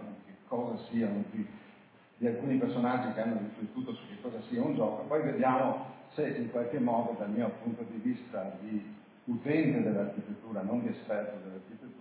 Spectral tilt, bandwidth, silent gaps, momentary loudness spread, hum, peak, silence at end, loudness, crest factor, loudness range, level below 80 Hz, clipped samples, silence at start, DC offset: -7 dB/octave; 4 kHz; none; 13 LU; none; -16 dBFS; 0 s; -34 LUFS; 18 dB; 3 LU; -78 dBFS; under 0.1%; 0 s; under 0.1%